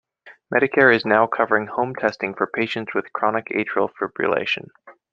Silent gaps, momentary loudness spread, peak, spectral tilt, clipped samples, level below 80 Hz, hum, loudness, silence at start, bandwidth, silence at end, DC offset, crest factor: none; 10 LU; -2 dBFS; -6.5 dB/octave; under 0.1%; -66 dBFS; none; -21 LUFS; 0.25 s; 7.4 kHz; 0.2 s; under 0.1%; 20 dB